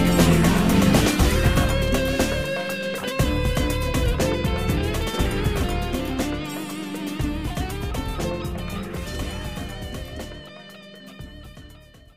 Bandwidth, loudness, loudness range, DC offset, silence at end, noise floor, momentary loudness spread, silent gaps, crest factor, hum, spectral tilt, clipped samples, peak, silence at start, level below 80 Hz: 15.5 kHz; -23 LUFS; 11 LU; 0.3%; 0.1 s; -47 dBFS; 20 LU; none; 18 dB; none; -5.5 dB/octave; under 0.1%; -6 dBFS; 0 s; -30 dBFS